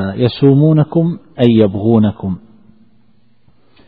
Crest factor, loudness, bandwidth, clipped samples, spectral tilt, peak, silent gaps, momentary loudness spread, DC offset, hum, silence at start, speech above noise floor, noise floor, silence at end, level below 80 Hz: 14 dB; -13 LUFS; 4.9 kHz; under 0.1%; -11 dB/octave; 0 dBFS; none; 12 LU; 0.4%; none; 0 s; 44 dB; -55 dBFS; 1.5 s; -48 dBFS